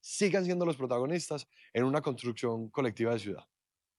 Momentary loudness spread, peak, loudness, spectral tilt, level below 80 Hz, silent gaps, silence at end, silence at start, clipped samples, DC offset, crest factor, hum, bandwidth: 9 LU; -16 dBFS; -33 LUFS; -5.5 dB/octave; -82 dBFS; none; 0.55 s; 0.05 s; under 0.1%; under 0.1%; 16 dB; none; 12 kHz